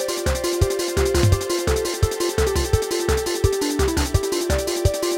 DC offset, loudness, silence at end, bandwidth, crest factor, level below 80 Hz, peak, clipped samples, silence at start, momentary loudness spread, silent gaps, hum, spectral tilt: under 0.1%; -21 LUFS; 0 s; 17 kHz; 16 dB; -28 dBFS; -4 dBFS; under 0.1%; 0 s; 3 LU; none; none; -4.5 dB/octave